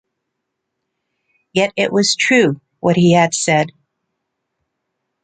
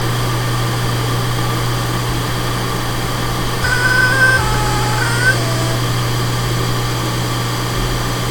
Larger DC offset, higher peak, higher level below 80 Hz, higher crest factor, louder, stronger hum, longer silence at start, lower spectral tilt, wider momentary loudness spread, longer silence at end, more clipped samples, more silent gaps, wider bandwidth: neither; about the same, 0 dBFS vs 0 dBFS; second, -58 dBFS vs -28 dBFS; about the same, 18 dB vs 16 dB; about the same, -15 LUFS vs -16 LUFS; neither; first, 1.55 s vs 0 s; about the same, -4.5 dB/octave vs -4 dB/octave; about the same, 7 LU vs 7 LU; first, 1.55 s vs 0 s; neither; neither; second, 9.4 kHz vs 17.5 kHz